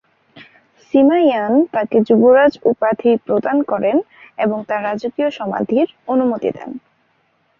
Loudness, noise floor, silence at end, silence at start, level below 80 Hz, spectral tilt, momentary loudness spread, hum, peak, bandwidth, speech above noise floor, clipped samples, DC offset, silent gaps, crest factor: -16 LUFS; -61 dBFS; 0.8 s; 0.35 s; -60 dBFS; -8 dB/octave; 10 LU; none; -2 dBFS; 6.8 kHz; 46 dB; under 0.1%; under 0.1%; none; 14 dB